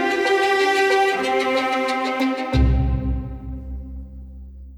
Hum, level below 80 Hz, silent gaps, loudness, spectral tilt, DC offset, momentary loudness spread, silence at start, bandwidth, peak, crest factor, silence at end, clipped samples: none; -28 dBFS; none; -20 LUFS; -5.5 dB/octave; under 0.1%; 20 LU; 0 s; 14 kHz; -6 dBFS; 14 dB; 0 s; under 0.1%